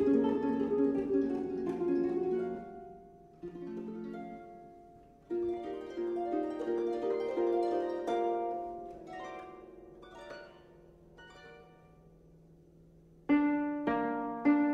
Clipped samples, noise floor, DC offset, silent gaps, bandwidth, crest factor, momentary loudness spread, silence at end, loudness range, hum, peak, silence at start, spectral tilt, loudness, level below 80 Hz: under 0.1%; -59 dBFS; under 0.1%; none; 7 kHz; 18 dB; 22 LU; 0 s; 16 LU; none; -16 dBFS; 0 s; -7.5 dB/octave; -34 LUFS; -66 dBFS